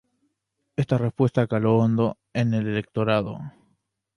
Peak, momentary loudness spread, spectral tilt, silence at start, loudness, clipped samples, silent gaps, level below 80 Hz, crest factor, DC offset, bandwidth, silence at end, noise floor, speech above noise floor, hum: -6 dBFS; 13 LU; -8.5 dB/octave; 0.8 s; -24 LUFS; under 0.1%; none; -56 dBFS; 18 dB; under 0.1%; 10.5 kHz; 0.65 s; -76 dBFS; 54 dB; none